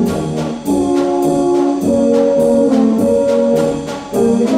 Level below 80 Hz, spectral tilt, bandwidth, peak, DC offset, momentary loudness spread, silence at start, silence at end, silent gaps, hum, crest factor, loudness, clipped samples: -44 dBFS; -6.5 dB/octave; 15.5 kHz; -2 dBFS; under 0.1%; 7 LU; 0 s; 0 s; none; none; 10 dB; -14 LUFS; under 0.1%